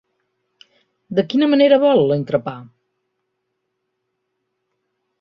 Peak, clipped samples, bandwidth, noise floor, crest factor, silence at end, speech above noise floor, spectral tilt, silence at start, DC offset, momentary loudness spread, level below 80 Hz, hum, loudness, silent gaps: -2 dBFS; under 0.1%; 6.2 kHz; -74 dBFS; 18 dB; 2.55 s; 59 dB; -8 dB/octave; 1.1 s; under 0.1%; 13 LU; -64 dBFS; none; -16 LUFS; none